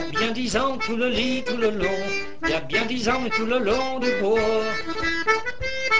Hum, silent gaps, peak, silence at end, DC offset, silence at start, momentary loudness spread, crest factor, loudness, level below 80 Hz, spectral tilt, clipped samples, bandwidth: none; none; -8 dBFS; 0 s; 3%; 0 s; 5 LU; 16 dB; -23 LUFS; -44 dBFS; -4 dB/octave; under 0.1%; 8 kHz